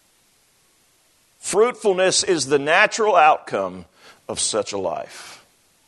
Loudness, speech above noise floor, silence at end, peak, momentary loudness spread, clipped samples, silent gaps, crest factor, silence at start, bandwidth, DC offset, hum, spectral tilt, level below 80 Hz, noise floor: -19 LUFS; 41 dB; 0.55 s; 0 dBFS; 17 LU; under 0.1%; none; 20 dB; 1.45 s; 12.5 kHz; under 0.1%; none; -2 dB/octave; -66 dBFS; -60 dBFS